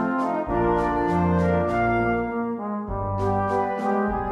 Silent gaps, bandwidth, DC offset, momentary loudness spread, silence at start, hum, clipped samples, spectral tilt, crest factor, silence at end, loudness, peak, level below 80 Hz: none; 9.6 kHz; under 0.1%; 7 LU; 0 s; none; under 0.1%; -9 dB/octave; 14 dB; 0 s; -24 LUFS; -10 dBFS; -40 dBFS